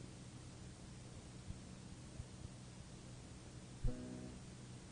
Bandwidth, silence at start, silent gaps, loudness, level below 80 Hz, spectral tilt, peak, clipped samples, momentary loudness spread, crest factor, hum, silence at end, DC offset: 10 kHz; 0 s; none; -53 LUFS; -54 dBFS; -5.5 dB/octave; -28 dBFS; under 0.1%; 8 LU; 22 dB; none; 0 s; under 0.1%